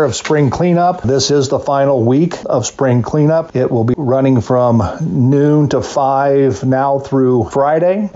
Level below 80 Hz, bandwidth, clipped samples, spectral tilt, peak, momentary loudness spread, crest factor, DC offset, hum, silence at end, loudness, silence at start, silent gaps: -44 dBFS; 8 kHz; under 0.1%; -7 dB/octave; -4 dBFS; 3 LU; 8 dB; under 0.1%; none; 0.05 s; -13 LUFS; 0 s; none